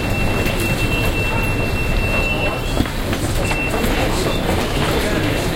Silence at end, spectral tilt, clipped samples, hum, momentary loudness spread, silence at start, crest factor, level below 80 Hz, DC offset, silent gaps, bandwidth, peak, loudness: 0 s; -5 dB/octave; under 0.1%; none; 2 LU; 0 s; 16 dB; -24 dBFS; under 0.1%; none; 17 kHz; -2 dBFS; -19 LUFS